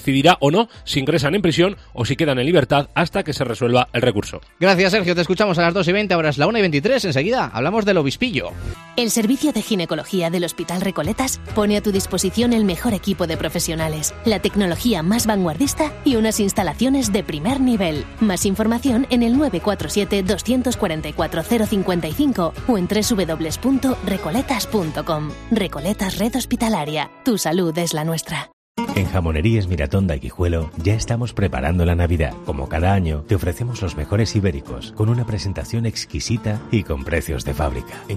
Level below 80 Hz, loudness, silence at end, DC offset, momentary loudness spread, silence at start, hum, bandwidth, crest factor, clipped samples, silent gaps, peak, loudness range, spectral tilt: -34 dBFS; -20 LUFS; 0 s; under 0.1%; 7 LU; 0 s; none; 15.5 kHz; 18 dB; under 0.1%; 28.53-28.75 s; -2 dBFS; 4 LU; -5 dB/octave